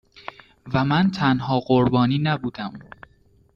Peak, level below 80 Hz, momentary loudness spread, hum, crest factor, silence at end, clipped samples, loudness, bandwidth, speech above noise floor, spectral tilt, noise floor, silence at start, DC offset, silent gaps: -6 dBFS; -52 dBFS; 21 LU; none; 16 dB; 0.75 s; under 0.1%; -21 LUFS; 7 kHz; 37 dB; -8 dB/octave; -57 dBFS; 0.65 s; under 0.1%; none